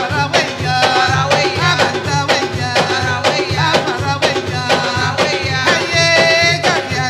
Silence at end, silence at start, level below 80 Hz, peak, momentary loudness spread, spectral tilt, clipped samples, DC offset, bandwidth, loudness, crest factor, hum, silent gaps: 0 s; 0 s; -42 dBFS; 0 dBFS; 5 LU; -3.5 dB/octave; under 0.1%; under 0.1%; 15 kHz; -13 LUFS; 14 dB; none; none